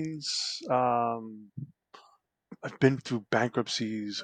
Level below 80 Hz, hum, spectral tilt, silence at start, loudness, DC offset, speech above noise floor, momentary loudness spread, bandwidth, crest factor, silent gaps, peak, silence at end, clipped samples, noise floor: -72 dBFS; none; -4.5 dB/octave; 0 s; -29 LUFS; under 0.1%; 35 dB; 17 LU; 9.6 kHz; 22 dB; none; -8 dBFS; 0 s; under 0.1%; -65 dBFS